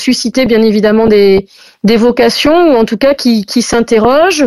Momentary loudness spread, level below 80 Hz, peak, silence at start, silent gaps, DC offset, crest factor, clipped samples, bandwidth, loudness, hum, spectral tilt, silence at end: 4 LU; -38 dBFS; 0 dBFS; 0 s; none; under 0.1%; 8 dB; under 0.1%; 14.5 kHz; -9 LUFS; none; -4.5 dB/octave; 0 s